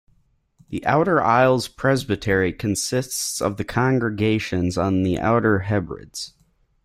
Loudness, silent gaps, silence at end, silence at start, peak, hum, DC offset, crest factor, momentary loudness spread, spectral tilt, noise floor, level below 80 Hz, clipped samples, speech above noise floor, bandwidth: -21 LUFS; none; 0.55 s; 0.7 s; -4 dBFS; none; under 0.1%; 18 dB; 10 LU; -5 dB/octave; -62 dBFS; -48 dBFS; under 0.1%; 41 dB; 16 kHz